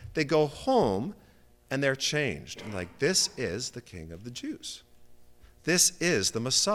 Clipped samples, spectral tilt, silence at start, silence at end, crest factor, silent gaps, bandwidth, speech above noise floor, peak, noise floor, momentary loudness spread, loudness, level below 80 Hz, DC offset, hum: under 0.1%; -3 dB/octave; 0 s; 0 s; 20 dB; none; 17 kHz; 25 dB; -10 dBFS; -53 dBFS; 17 LU; -27 LUFS; -56 dBFS; under 0.1%; 60 Hz at -65 dBFS